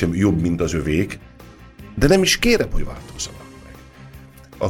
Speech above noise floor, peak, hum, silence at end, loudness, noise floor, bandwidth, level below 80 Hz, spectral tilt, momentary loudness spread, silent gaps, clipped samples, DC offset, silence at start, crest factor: 24 dB; -2 dBFS; none; 0 s; -19 LUFS; -43 dBFS; 16.5 kHz; -32 dBFS; -4.5 dB/octave; 19 LU; none; under 0.1%; under 0.1%; 0 s; 18 dB